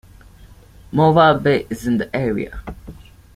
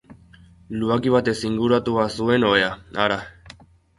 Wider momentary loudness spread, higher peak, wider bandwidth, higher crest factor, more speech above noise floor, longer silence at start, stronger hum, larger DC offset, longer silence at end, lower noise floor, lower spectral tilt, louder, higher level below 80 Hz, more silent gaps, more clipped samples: first, 21 LU vs 9 LU; about the same, -2 dBFS vs -2 dBFS; first, 15 kHz vs 11.5 kHz; about the same, 18 dB vs 20 dB; about the same, 27 dB vs 29 dB; first, 0.9 s vs 0.1 s; neither; neither; about the same, 0.45 s vs 0.5 s; second, -44 dBFS vs -49 dBFS; about the same, -7 dB/octave vs -6 dB/octave; first, -17 LUFS vs -21 LUFS; first, -42 dBFS vs -50 dBFS; neither; neither